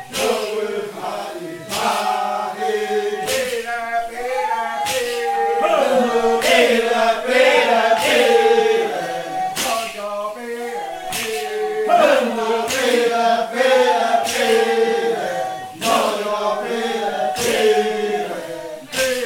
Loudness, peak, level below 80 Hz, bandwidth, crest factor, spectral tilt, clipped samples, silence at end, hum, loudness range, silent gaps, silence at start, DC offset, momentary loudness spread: -18 LUFS; 0 dBFS; -56 dBFS; 18 kHz; 18 dB; -2 dB/octave; under 0.1%; 0 s; none; 7 LU; none; 0 s; under 0.1%; 12 LU